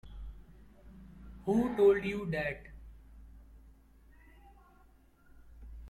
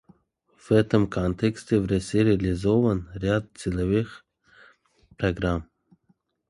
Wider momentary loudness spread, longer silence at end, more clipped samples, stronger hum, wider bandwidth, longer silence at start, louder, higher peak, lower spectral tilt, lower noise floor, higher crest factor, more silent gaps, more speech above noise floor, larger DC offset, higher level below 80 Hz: first, 28 LU vs 7 LU; second, 0 s vs 0.85 s; neither; neither; about the same, 12.5 kHz vs 11.5 kHz; second, 0.05 s vs 0.7 s; second, -31 LUFS vs -25 LUFS; second, -16 dBFS vs -6 dBFS; about the same, -7.5 dB/octave vs -7.5 dB/octave; second, -62 dBFS vs -68 dBFS; about the same, 20 dB vs 20 dB; neither; second, 33 dB vs 44 dB; neither; second, -52 dBFS vs -42 dBFS